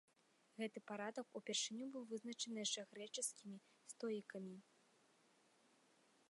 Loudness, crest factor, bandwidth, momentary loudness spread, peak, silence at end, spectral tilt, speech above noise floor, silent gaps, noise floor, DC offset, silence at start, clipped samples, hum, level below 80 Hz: -48 LUFS; 20 dB; 11.5 kHz; 15 LU; -30 dBFS; 1.7 s; -2 dB/octave; 29 dB; none; -77 dBFS; under 0.1%; 0.55 s; under 0.1%; none; under -90 dBFS